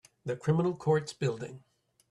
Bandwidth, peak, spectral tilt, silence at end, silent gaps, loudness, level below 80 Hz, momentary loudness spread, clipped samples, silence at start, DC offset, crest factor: 11 kHz; -16 dBFS; -7 dB/octave; 0.55 s; none; -31 LUFS; -70 dBFS; 12 LU; under 0.1%; 0.25 s; under 0.1%; 16 dB